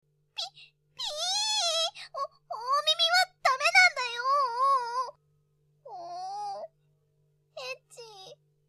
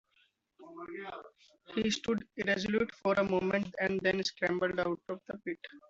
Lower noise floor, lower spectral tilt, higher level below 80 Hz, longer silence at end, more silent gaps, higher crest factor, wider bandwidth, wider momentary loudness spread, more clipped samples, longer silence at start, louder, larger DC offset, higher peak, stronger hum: about the same, -70 dBFS vs -73 dBFS; second, 2.5 dB/octave vs -5 dB/octave; second, -76 dBFS vs -66 dBFS; first, 0.35 s vs 0.1 s; neither; about the same, 22 dB vs 20 dB; first, 14.5 kHz vs 8 kHz; first, 20 LU vs 14 LU; neither; second, 0.35 s vs 0.6 s; first, -26 LUFS vs -33 LUFS; neither; first, -8 dBFS vs -14 dBFS; neither